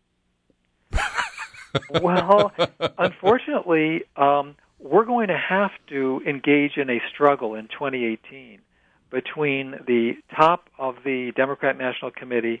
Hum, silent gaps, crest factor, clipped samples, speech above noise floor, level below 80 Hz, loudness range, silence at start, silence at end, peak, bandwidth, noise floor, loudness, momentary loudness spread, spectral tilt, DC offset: none; none; 22 dB; under 0.1%; 48 dB; -44 dBFS; 4 LU; 0.9 s; 0 s; -2 dBFS; 10.5 kHz; -70 dBFS; -22 LUFS; 10 LU; -6 dB/octave; under 0.1%